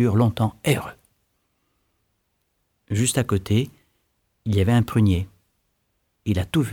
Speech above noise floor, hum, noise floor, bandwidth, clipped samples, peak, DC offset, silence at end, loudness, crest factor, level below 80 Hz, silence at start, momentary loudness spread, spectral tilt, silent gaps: 52 dB; none; -72 dBFS; 17.5 kHz; under 0.1%; -6 dBFS; under 0.1%; 0 s; -22 LUFS; 18 dB; -46 dBFS; 0 s; 14 LU; -6 dB/octave; none